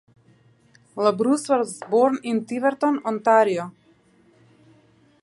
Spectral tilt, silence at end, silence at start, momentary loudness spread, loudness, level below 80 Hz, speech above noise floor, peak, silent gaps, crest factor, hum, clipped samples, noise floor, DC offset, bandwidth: -5 dB/octave; 1.5 s; 0.95 s; 8 LU; -21 LUFS; -76 dBFS; 37 dB; -4 dBFS; none; 20 dB; none; under 0.1%; -58 dBFS; under 0.1%; 11.5 kHz